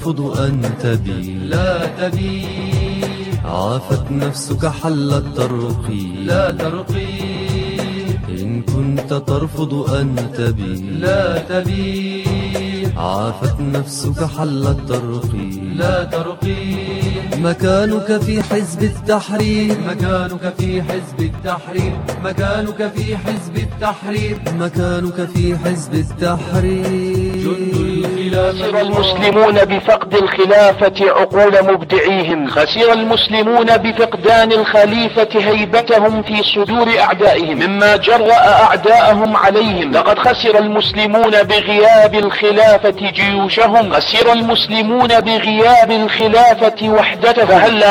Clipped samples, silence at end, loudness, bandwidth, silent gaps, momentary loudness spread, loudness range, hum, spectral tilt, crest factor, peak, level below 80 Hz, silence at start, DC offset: under 0.1%; 0 s; -14 LUFS; 17 kHz; none; 12 LU; 9 LU; none; -5.5 dB/octave; 14 dB; 0 dBFS; -34 dBFS; 0 s; under 0.1%